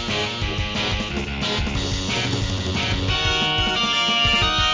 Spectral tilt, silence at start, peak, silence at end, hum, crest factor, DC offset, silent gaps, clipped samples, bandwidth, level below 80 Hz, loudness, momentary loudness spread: -3.5 dB/octave; 0 s; -6 dBFS; 0 s; none; 14 dB; 0.2%; none; under 0.1%; 7.6 kHz; -32 dBFS; -20 LUFS; 7 LU